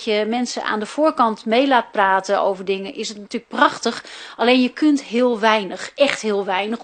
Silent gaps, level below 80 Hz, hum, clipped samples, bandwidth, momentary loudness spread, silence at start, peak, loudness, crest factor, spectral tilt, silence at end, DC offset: none; -66 dBFS; none; under 0.1%; 9.8 kHz; 11 LU; 0 s; 0 dBFS; -19 LUFS; 18 dB; -3.5 dB/octave; 0.05 s; under 0.1%